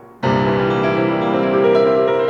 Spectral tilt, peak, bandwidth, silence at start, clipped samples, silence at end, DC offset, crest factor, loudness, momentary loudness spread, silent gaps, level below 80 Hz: -8 dB/octave; -4 dBFS; 7.2 kHz; 0.2 s; under 0.1%; 0 s; under 0.1%; 12 dB; -16 LUFS; 4 LU; none; -48 dBFS